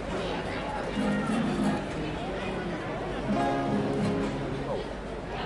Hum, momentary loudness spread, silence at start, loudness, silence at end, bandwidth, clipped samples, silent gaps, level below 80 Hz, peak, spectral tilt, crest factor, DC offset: none; 6 LU; 0 s; -30 LUFS; 0 s; 11.5 kHz; under 0.1%; none; -44 dBFS; -16 dBFS; -6.5 dB/octave; 14 dB; under 0.1%